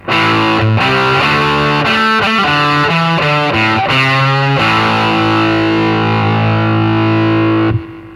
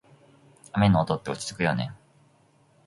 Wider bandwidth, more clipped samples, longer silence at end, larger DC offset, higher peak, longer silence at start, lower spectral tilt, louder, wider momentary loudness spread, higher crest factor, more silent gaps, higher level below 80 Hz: about the same, 11.5 kHz vs 11.5 kHz; neither; second, 0 s vs 0.9 s; neither; first, 0 dBFS vs -8 dBFS; second, 0.05 s vs 0.75 s; about the same, -6 dB/octave vs -6 dB/octave; first, -11 LUFS vs -26 LUFS; second, 2 LU vs 11 LU; second, 12 dB vs 18 dB; neither; first, -40 dBFS vs -50 dBFS